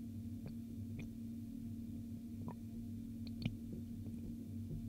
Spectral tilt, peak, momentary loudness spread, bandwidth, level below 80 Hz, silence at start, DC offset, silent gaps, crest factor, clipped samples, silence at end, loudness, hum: -7.5 dB/octave; -26 dBFS; 4 LU; 16 kHz; -60 dBFS; 0 s; under 0.1%; none; 20 dB; under 0.1%; 0 s; -48 LUFS; none